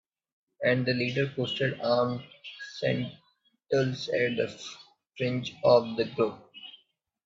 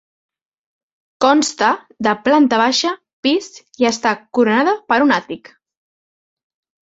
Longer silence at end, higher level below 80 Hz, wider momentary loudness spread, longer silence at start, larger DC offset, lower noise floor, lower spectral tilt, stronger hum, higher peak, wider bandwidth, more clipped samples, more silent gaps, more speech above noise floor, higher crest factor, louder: second, 0.55 s vs 1.5 s; second, -68 dBFS vs -62 dBFS; first, 19 LU vs 8 LU; second, 0.6 s vs 1.2 s; neither; second, -70 dBFS vs under -90 dBFS; first, -6 dB/octave vs -3 dB/octave; neither; second, -8 dBFS vs 0 dBFS; about the same, 7.8 kHz vs 8 kHz; neither; second, none vs 3.13-3.23 s; second, 42 dB vs over 74 dB; about the same, 22 dB vs 18 dB; second, -28 LUFS vs -16 LUFS